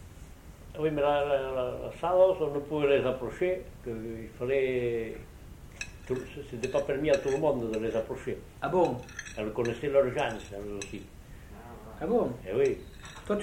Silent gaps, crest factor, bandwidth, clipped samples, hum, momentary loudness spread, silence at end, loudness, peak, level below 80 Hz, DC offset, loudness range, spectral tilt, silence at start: none; 18 dB; 16.5 kHz; under 0.1%; none; 20 LU; 0 s; -30 LUFS; -12 dBFS; -50 dBFS; under 0.1%; 5 LU; -6 dB/octave; 0 s